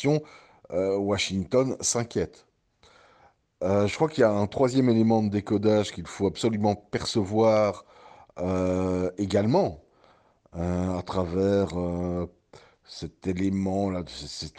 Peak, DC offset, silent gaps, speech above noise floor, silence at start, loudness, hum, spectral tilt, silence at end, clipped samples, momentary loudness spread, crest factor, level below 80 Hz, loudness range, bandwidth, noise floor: -8 dBFS; under 0.1%; none; 35 dB; 0 s; -26 LUFS; none; -5.5 dB/octave; 0.1 s; under 0.1%; 12 LU; 18 dB; -54 dBFS; 5 LU; 12 kHz; -60 dBFS